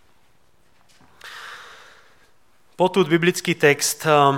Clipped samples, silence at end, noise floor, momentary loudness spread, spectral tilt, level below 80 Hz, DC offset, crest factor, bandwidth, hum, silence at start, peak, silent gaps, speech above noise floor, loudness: under 0.1%; 0 s; -61 dBFS; 21 LU; -4 dB/octave; -68 dBFS; 0.2%; 20 dB; 17 kHz; none; 1.25 s; -2 dBFS; none; 44 dB; -18 LUFS